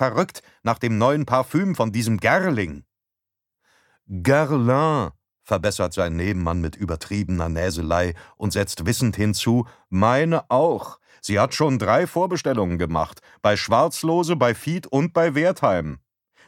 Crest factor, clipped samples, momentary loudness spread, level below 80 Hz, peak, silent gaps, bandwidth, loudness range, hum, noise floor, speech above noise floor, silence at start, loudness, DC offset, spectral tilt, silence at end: 20 dB; under 0.1%; 9 LU; -44 dBFS; -2 dBFS; none; 17 kHz; 3 LU; none; -85 dBFS; 64 dB; 0 s; -22 LUFS; under 0.1%; -6 dB/octave; 0.5 s